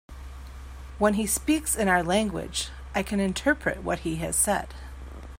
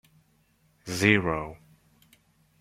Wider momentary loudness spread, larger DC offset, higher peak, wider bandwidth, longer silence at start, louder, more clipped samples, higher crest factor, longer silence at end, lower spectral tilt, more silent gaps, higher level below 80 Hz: about the same, 20 LU vs 20 LU; neither; second, -8 dBFS vs -4 dBFS; about the same, 16 kHz vs 15.5 kHz; second, 0.1 s vs 0.85 s; about the same, -26 LUFS vs -25 LUFS; neither; second, 20 dB vs 26 dB; second, 0.05 s vs 1.05 s; second, -3.5 dB/octave vs -5 dB/octave; neither; first, -42 dBFS vs -56 dBFS